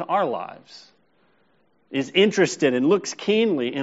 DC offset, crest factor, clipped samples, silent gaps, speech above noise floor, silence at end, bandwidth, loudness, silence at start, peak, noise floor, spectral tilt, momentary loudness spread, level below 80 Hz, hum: under 0.1%; 18 dB; under 0.1%; none; 43 dB; 0 s; 8 kHz; -21 LUFS; 0 s; -4 dBFS; -65 dBFS; -3.5 dB/octave; 11 LU; -72 dBFS; none